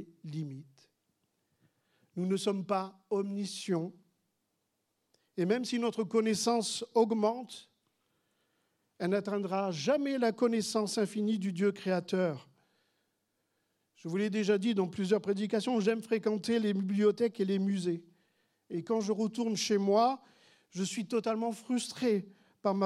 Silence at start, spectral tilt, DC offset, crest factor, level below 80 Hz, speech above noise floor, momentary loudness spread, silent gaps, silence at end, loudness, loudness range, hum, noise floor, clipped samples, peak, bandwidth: 0 s; -5.5 dB/octave; under 0.1%; 18 dB; -86 dBFS; 50 dB; 12 LU; none; 0 s; -32 LUFS; 5 LU; none; -81 dBFS; under 0.1%; -14 dBFS; 13.5 kHz